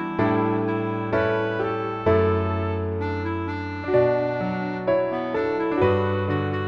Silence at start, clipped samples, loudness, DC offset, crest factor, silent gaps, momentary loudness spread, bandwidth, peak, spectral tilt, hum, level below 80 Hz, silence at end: 0 s; under 0.1%; -24 LUFS; under 0.1%; 16 dB; none; 6 LU; 6.2 kHz; -8 dBFS; -9 dB/octave; none; -50 dBFS; 0 s